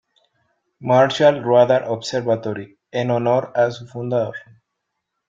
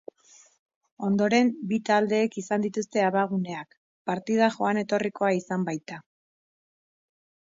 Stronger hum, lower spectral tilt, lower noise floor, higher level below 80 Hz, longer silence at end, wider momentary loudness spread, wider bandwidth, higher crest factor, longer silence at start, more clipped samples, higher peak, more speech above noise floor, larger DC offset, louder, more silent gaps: neither; about the same, -6 dB/octave vs -6 dB/octave; first, -78 dBFS vs -57 dBFS; first, -64 dBFS vs -74 dBFS; second, 0.9 s vs 1.55 s; about the same, 14 LU vs 12 LU; about the same, 7.8 kHz vs 7.8 kHz; about the same, 18 dB vs 18 dB; second, 0.8 s vs 1 s; neither; first, -2 dBFS vs -10 dBFS; first, 60 dB vs 32 dB; neither; first, -19 LUFS vs -26 LUFS; second, none vs 3.77-4.05 s